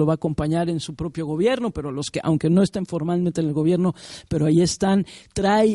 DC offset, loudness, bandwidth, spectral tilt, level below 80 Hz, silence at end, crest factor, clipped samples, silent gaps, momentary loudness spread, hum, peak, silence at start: under 0.1%; -22 LUFS; 11.5 kHz; -6.5 dB/octave; -46 dBFS; 0 s; 14 dB; under 0.1%; none; 9 LU; none; -6 dBFS; 0 s